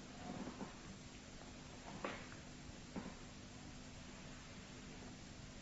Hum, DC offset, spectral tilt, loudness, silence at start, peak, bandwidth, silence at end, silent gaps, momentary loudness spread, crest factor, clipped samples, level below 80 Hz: none; under 0.1%; -4 dB/octave; -53 LUFS; 0 s; -28 dBFS; 7.6 kHz; 0 s; none; 6 LU; 24 dB; under 0.1%; -62 dBFS